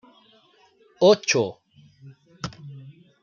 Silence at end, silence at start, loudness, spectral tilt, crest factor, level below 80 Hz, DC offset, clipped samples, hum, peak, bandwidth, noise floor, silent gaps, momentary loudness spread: 0.3 s; 1 s; -20 LUFS; -4 dB/octave; 22 dB; -64 dBFS; under 0.1%; under 0.1%; none; -4 dBFS; 7.4 kHz; -59 dBFS; none; 25 LU